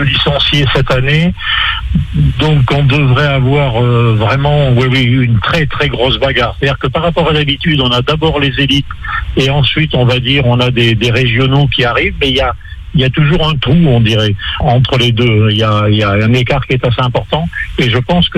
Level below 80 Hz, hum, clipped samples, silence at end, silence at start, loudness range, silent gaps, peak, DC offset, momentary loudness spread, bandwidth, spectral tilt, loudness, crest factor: -24 dBFS; none; under 0.1%; 0 s; 0 s; 1 LU; none; 0 dBFS; under 0.1%; 4 LU; 9 kHz; -6.5 dB/octave; -11 LUFS; 10 dB